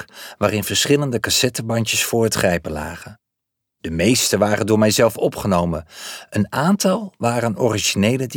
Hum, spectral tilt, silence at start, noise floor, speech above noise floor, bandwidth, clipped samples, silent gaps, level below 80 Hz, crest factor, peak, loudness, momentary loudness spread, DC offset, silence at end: none; -4 dB/octave; 0 s; -80 dBFS; 61 dB; 20 kHz; under 0.1%; none; -46 dBFS; 16 dB; -4 dBFS; -18 LUFS; 12 LU; under 0.1%; 0 s